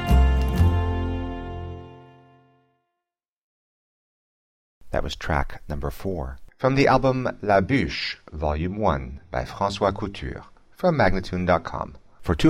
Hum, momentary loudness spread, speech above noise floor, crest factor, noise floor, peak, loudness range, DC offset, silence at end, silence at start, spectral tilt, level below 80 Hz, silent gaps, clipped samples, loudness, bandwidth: none; 14 LU; 63 dB; 18 dB; -86 dBFS; -6 dBFS; 14 LU; under 0.1%; 0 s; 0 s; -7 dB/octave; -30 dBFS; 3.28-4.81 s; under 0.1%; -24 LUFS; 15 kHz